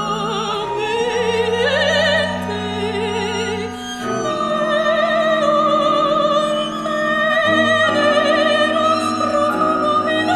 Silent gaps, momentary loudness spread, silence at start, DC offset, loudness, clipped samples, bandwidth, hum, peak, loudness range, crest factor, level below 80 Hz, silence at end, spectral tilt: none; 7 LU; 0 s; under 0.1%; -17 LUFS; under 0.1%; 13.5 kHz; none; -2 dBFS; 4 LU; 14 dB; -50 dBFS; 0 s; -4 dB/octave